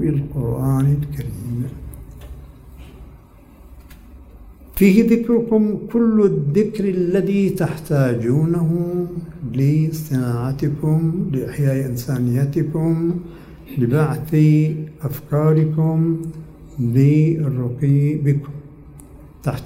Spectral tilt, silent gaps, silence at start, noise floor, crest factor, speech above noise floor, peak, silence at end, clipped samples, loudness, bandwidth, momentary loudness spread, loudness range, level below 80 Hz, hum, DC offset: -9 dB/octave; none; 0 s; -44 dBFS; 18 dB; 27 dB; 0 dBFS; 0 s; under 0.1%; -19 LUFS; 16 kHz; 13 LU; 7 LU; -42 dBFS; none; under 0.1%